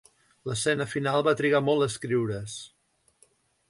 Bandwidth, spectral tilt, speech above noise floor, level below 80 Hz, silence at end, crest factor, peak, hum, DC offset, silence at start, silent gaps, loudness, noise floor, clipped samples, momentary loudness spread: 11.5 kHz; -5 dB/octave; 38 dB; -62 dBFS; 1.05 s; 18 dB; -10 dBFS; none; under 0.1%; 0.45 s; none; -26 LUFS; -65 dBFS; under 0.1%; 16 LU